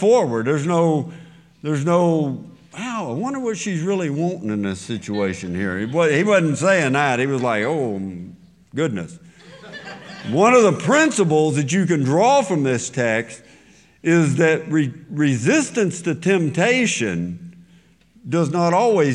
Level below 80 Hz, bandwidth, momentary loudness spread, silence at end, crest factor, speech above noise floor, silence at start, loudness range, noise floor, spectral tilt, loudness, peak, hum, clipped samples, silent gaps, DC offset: -64 dBFS; 11 kHz; 16 LU; 0 s; 16 dB; 34 dB; 0 s; 6 LU; -53 dBFS; -5.5 dB/octave; -19 LUFS; -2 dBFS; none; under 0.1%; none; under 0.1%